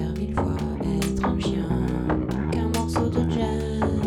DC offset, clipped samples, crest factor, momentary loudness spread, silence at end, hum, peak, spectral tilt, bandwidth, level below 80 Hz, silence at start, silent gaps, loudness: under 0.1%; under 0.1%; 12 dB; 3 LU; 0 s; none; -12 dBFS; -7 dB/octave; 16 kHz; -34 dBFS; 0 s; none; -25 LUFS